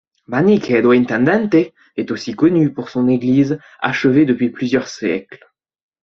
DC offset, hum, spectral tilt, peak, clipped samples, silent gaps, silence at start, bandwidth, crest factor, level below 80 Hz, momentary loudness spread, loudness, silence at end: under 0.1%; none; -7 dB/octave; 0 dBFS; under 0.1%; none; 0.3 s; 7.2 kHz; 16 dB; -56 dBFS; 10 LU; -16 LUFS; 0.65 s